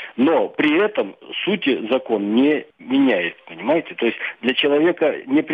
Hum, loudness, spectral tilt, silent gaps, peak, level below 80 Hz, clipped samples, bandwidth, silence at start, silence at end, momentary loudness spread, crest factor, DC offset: none; -19 LUFS; -7.5 dB/octave; none; -6 dBFS; -68 dBFS; under 0.1%; 4.9 kHz; 0 s; 0 s; 7 LU; 14 dB; under 0.1%